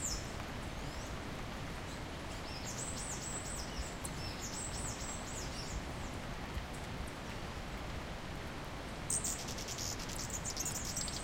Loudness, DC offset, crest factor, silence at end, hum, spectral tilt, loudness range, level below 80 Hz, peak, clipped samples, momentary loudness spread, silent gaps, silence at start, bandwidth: -41 LUFS; under 0.1%; 22 dB; 0 s; none; -3 dB/octave; 4 LU; -48 dBFS; -20 dBFS; under 0.1%; 7 LU; none; 0 s; 16.5 kHz